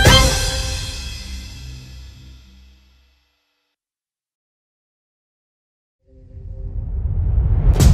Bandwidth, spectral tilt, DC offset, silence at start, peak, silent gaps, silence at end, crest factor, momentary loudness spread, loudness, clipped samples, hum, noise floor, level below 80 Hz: 14.5 kHz; -4 dB/octave; under 0.1%; 0 s; 0 dBFS; 4.34-5.99 s; 0 s; 20 dB; 24 LU; -19 LUFS; under 0.1%; none; under -90 dBFS; -24 dBFS